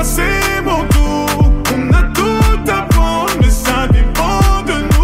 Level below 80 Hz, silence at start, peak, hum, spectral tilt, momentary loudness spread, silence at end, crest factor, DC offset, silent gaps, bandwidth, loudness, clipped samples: -14 dBFS; 0 s; -2 dBFS; none; -5 dB/octave; 2 LU; 0 s; 10 dB; under 0.1%; none; 16.5 kHz; -13 LUFS; under 0.1%